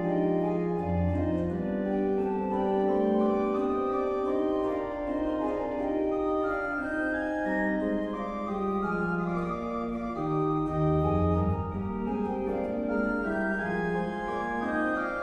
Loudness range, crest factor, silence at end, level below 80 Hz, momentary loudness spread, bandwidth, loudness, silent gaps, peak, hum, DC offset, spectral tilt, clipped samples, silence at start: 2 LU; 14 dB; 0 s; -48 dBFS; 6 LU; 9.2 kHz; -29 LUFS; none; -14 dBFS; none; under 0.1%; -9 dB/octave; under 0.1%; 0 s